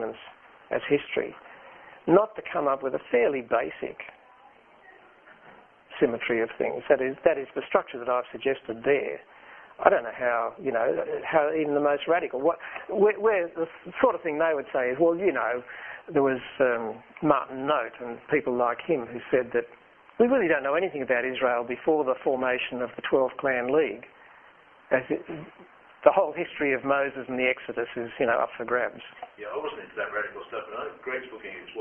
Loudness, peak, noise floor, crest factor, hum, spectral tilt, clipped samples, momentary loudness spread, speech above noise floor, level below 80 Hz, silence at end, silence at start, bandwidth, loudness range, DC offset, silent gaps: -27 LUFS; 0 dBFS; -55 dBFS; 26 dB; none; -9 dB/octave; under 0.1%; 13 LU; 29 dB; -66 dBFS; 0 s; 0 s; 3.6 kHz; 4 LU; under 0.1%; none